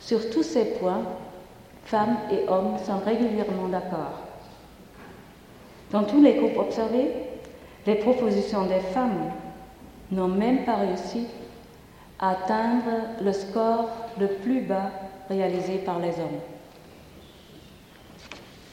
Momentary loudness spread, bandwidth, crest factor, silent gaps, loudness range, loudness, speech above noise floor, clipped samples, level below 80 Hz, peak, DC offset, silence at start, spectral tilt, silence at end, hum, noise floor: 20 LU; 16.5 kHz; 20 dB; none; 6 LU; -26 LUFS; 25 dB; under 0.1%; -56 dBFS; -6 dBFS; under 0.1%; 0 s; -7 dB/octave; 0 s; none; -49 dBFS